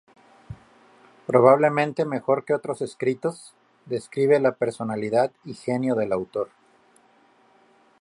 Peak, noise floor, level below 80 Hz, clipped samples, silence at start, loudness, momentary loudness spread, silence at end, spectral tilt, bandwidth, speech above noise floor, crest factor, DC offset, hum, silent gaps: -2 dBFS; -59 dBFS; -64 dBFS; under 0.1%; 0.5 s; -23 LUFS; 18 LU; 1.55 s; -7 dB/octave; 11.5 kHz; 36 dB; 22 dB; under 0.1%; none; none